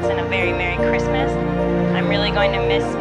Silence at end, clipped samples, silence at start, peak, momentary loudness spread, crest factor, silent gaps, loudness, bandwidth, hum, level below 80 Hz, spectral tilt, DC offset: 0 s; under 0.1%; 0 s; -6 dBFS; 2 LU; 14 dB; none; -19 LUFS; 10.5 kHz; 60 Hz at -40 dBFS; -32 dBFS; -6.5 dB/octave; under 0.1%